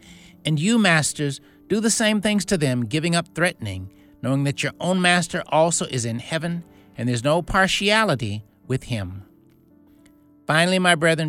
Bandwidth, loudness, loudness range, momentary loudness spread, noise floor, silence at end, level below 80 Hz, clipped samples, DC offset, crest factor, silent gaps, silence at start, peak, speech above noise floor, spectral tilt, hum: 16 kHz; -21 LUFS; 2 LU; 15 LU; -54 dBFS; 0 s; -48 dBFS; under 0.1%; under 0.1%; 20 dB; none; 0.05 s; -2 dBFS; 33 dB; -4 dB/octave; none